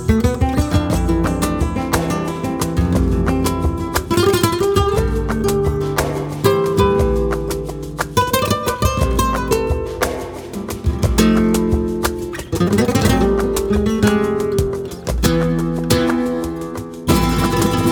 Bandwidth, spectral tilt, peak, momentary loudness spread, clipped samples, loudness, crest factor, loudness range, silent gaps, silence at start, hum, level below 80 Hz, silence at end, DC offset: over 20 kHz; -5.5 dB/octave; -2 dBFS; 8 LU; under 0.1%; -18 LUFS; 16 dB; 2 LU; none; 0 s; none; -26 dBFS; 0 s; under 0.1%